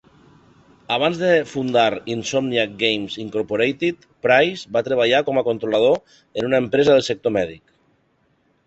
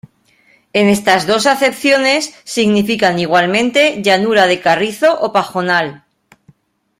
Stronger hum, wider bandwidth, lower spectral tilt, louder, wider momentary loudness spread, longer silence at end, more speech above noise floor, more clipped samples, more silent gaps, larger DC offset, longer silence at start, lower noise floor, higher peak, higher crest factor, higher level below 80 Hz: neither; second, 8.2 kHz vs 16 kHz; about the same, -4.5 dB/octave vs -4 dB/octave; second, -19 LUFS vs -13 LUFS; first, 9 LU vs 5 LU; about the same, 1.1 s vs 1.05 s; first, 44 dB vs 40 dB; neither; neither; neither; first, 0.9 s vs 0.75 s; first, -63 dBFS vs -53 dBFS; about the same, -2 dBFS vs 0 dBFS; about the same, 18 dB vs 14 dB; about the same, -58 dBFS vs -56 dBFS